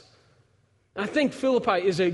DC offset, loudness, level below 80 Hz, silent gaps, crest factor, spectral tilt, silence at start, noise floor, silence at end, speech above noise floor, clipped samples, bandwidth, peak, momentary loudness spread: under 0.1%; -25 LUFS; -64 dBFS; none; 18 dB; -5.5 dB/octave; 0.95 s; -65 dBFS; 0 s; 42 dB; under 0.1%; 11.5 kHz; -8 dBFS; 10 LU